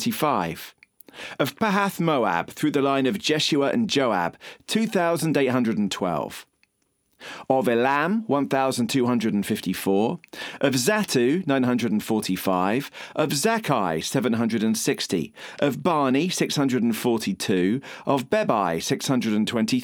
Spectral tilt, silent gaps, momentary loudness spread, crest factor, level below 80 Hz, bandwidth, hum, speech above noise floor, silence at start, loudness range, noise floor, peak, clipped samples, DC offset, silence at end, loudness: -4.5 dB/octave; none; 7 LU; 18 dB; -64 dBFS; over 20 kHz; none; 47 dB; 0 s; 2 LU; -70 dBFS; -4 dBFS; under 0.1%; under 0.1%; 0 s; -23 LUFS